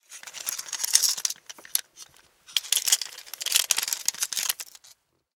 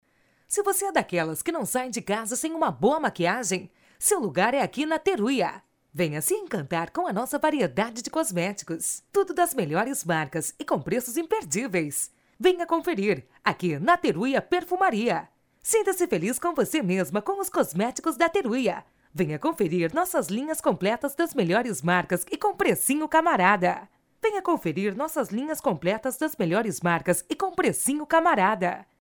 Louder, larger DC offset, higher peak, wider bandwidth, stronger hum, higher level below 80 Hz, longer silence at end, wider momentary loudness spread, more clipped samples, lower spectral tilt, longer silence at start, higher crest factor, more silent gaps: about the same, -25 LUFS vs -25 LUFS; neither; first, 0 dBFS vs -6 dBFS; about the same, 19 kHz vs over 20 kHz; neither; second, -82 dBFS vs -62 dBFS; first, 0.65 s vs 0.15 s; first, 13 LU vs 7 LU; neither; second, 4.5 dB/octave vs -4 dB/octave; second, 0.1 s vs 0.5 s; first, 28 dB vs 20 dB; neither